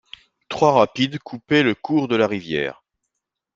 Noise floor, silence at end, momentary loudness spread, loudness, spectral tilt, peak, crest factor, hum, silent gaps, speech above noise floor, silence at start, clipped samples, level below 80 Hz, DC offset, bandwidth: -80 dBFS; 0.85 s; 11 LU; -20 LUFS; -6 dB/octave; -2 dBFS; 20 dB; none; none; 61 dB; 0.5 s; under 0.1%; -58 dBFS; under 0.1%; 7.6 kHz